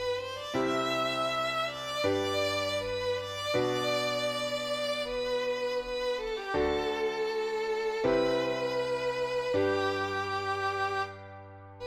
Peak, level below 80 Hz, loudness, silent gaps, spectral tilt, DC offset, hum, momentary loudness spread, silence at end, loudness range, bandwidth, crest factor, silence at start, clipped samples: -16 dBFS; -56 dBFS; -31 LUFS; none; -4 dB/octave; under 0.1%; none; 4 LU; 0 s; 1 LU; 16 kHz; 14 dB; 0 s; under 0.1%